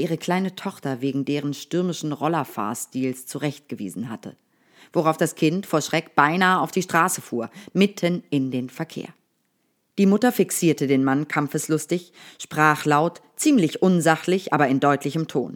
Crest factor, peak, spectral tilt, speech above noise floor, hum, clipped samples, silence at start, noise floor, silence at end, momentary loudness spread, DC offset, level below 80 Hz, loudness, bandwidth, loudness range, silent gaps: 22 dB; 0 dBFS; -5 dB/octave; 48 dB; none; under 0.1%; 0 s; -70 dBFS; 0 s; 12 LU; under 0.1%; -78 dBFS; -22 LUFS; over 20 kHz; 6 LU; none